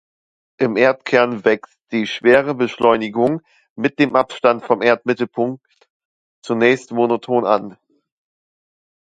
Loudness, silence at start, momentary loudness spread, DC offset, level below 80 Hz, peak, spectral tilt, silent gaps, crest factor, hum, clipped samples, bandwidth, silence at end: -17 LUFS; 0.6 s; 9 LU; under 0.1%; -60 dBFS; 0 dBFS; -6 dB/octave; 3.70-3.76 s, 5.90-6.42 s; 18 dB; none; under 0.1%; 9 kHz; 1.45 s